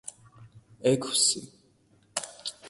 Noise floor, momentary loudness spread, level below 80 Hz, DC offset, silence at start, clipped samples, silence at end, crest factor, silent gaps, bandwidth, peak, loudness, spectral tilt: -64 dBFS; 14 LU; -70 dBFS; under 0.1%; 0.05 s; under 0.1%; 0 s; 22 dB; none; 12 kHz; -10 dBFS; -27 LUFS; -2.5 dB/octave